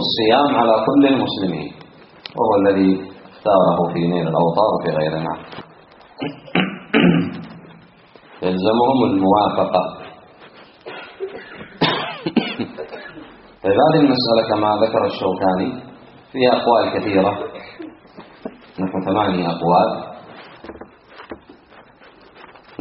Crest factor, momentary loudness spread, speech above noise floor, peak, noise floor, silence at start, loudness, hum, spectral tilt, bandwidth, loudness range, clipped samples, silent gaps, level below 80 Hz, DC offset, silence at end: 18 dB; 22 LU; 30 dB; 0 dBFS; -47 dBFS; 0 s; -17 LUFS; none; -4.5 dB/octave; 5.8 kHz; 5 LU; under 0.1%; none; -56 dBFS; under 0.1%; 0.4 s